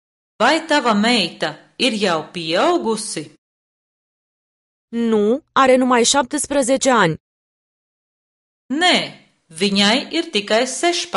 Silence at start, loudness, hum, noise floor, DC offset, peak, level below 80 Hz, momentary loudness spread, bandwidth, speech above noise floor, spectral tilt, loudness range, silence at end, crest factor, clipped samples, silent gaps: 0.4 s; -17 LUFS; none; under -90 dBFS; under 0.1%; 0 dBFS; -58 dBFS; 10 LU; 11.5 kHz; over 73 dB; -3 dB/octave; 5 LU; 0 s; 18 dB; under 0.1%; 3.38-4.88 s, 7.20-8.69 s